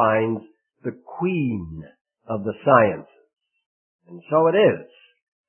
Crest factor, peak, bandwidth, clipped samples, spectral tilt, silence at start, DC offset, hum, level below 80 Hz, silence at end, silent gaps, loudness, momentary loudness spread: 22 dB; -2 dBFS; 3.3 kHz; under 0.1%; -11.5 dB/octave; 0 s; under 0.1%; none; -58 dBFS; 0.65 s; 2.01-2.05 s, 3.66-3.99 s; -21 LUFS; 17 LU